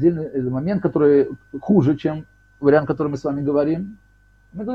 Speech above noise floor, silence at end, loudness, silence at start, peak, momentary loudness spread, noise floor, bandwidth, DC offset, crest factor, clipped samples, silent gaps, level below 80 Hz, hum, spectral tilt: 27 dB; 0 s; -20 LUFS; 0 s; -4 dBFS; 16 LU; -46 dBFS; 6.8 kHz; under 0.1%; 16 dB; under 0.1%; none; -52 dBFS; none; -9.5 dB/octave